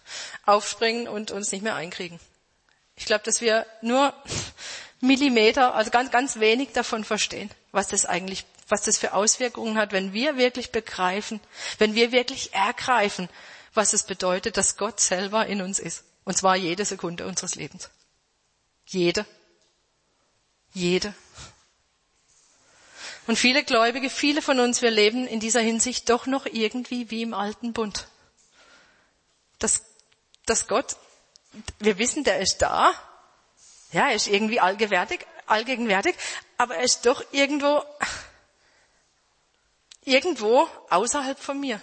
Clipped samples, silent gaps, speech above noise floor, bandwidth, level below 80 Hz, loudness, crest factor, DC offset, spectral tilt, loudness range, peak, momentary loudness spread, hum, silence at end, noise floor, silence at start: under 0.1%; none; 46 dB; 8.8 kHz; -58 dBFS; -23 LUFS; 20 dB; under 0.1%; -2.5 dB/octave; 8 LU; -6 dBFS; 13 LU; none; 0 s; -70 dBFS; 0.05 s